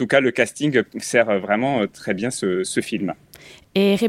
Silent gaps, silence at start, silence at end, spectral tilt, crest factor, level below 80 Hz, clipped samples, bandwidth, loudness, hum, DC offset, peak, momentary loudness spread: none; 0 s; 0 s; -4.5 dB/octave; 18 dB; -62 dBFS; under 0.1%; 16.5 kHz; -21 LUFS; none; under 0.1%; -2 dBFS; 8 LU